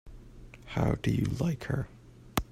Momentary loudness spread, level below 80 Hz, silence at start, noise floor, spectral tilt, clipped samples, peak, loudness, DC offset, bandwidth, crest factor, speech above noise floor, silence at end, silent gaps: 22 LU; -46 dBFS; 0.05 s; -49 dBFS; -6.5 dB/octave; under 0.1%; -12 dBFS; -32 LUFS; under 0.1%; 16 kHz; 22 dB; 20 dB; 0.1 s; none